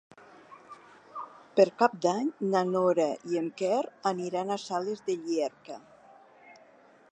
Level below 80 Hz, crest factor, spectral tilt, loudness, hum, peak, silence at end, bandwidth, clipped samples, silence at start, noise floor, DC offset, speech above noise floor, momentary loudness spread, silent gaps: -84 dBFS; 22 dB; -5.5 dB/octave; -29 LUFS; none; -8 dBFS; 0.6 s; 9.8 kHz; under 0.1%; 0.5 s; -58 dBFS; under 0.1%; 30 dB; 20 LU; none